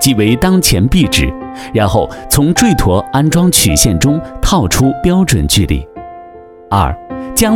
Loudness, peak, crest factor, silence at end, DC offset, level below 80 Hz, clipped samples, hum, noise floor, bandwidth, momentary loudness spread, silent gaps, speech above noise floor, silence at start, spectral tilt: -11 LUFS; 0 dBFS; 12 dB; 0 s; under 0.1%; -22 dBFS; under 0.1%; none; -34 dBFS; 18.5 kHz; 9 LU; none; 24 dB; 0 s; -4.5 dB/octave